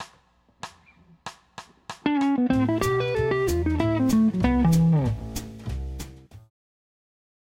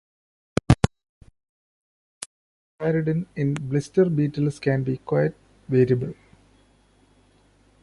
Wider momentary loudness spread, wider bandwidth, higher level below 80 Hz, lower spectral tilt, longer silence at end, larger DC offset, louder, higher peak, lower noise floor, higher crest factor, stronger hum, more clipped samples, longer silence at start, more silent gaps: first, 22 LU vs 12 LU; first, 16 kHz vs 11.5 kHz; first, -38 dBFS vs -44 dBFS; about the same, -7 dB/octave vs -7.5 dB/octave; second, 1.1 s vs 1.7 s; neither; about the same, -23 LUFS vs -24 LUFS; second, -6 dBFS vs -2 dBFS; about the same, -61 dBFS vs -59 dBFS; second, 18 dB vs 24 dB; neither; neither; second, 0 s vs 0.7 s; second, none vs 1.09-1.21 s, 1.49-2.78 s